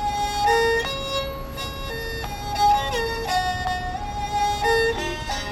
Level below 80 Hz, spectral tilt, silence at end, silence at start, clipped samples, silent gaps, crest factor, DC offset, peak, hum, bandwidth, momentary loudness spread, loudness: -36 dBFS; -3.5 dB/octave; 0 s; 0 s; under 0.1%; none; 16 dB; under 0.1%; -8 dBFS; none; 16 kHz; 10 LU; -23 LUFS